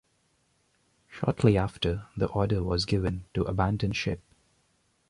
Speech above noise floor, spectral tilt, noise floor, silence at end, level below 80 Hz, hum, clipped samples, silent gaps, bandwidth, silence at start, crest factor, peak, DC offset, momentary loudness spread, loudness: 43 dB; -7 dB/octave; -70 dBFS; 0.9 s; -44 dBFS; none; under 0.1%; none; 11 kHz; 1.1 s; 22 dB; -8 dBFS; under 0.1%; 8 LU; -28 LUFS